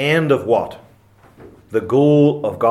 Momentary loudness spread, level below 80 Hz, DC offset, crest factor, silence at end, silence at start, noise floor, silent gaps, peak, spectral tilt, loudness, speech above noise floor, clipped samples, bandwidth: 11 LU; -58 dBFS; under 0.1%; 16 dB; 0 s; 0 s; -49 dBFS; none; -2 dBFS; -7.5 dB/octave; -16 LUFS; 34 dB; under 0.1%; 13 kHz